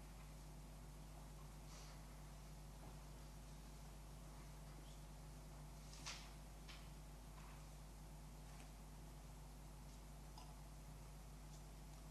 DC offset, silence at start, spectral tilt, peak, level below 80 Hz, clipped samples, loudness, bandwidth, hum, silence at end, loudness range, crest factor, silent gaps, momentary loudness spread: under 0.1%; 0 s; -4.5 dB/octave; -38 dBFS; -60 dBFS; under 0.1%; -59 LUFS; 13 kHz; none; 0 s; 2 LU; 20 dB; none; 2 LU